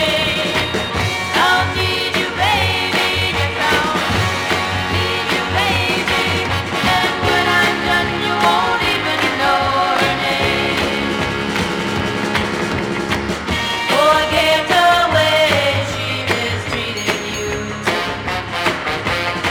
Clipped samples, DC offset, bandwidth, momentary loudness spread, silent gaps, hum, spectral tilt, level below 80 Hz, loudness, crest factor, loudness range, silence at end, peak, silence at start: under 0.1%; under 0.1%; 18.5 kHz; 7 LU; none; none; -4 dB/octave; -38 dBFS; -16 LUFS; 14 dB; 4 LU; 0 s; -2 dBFS; 0 s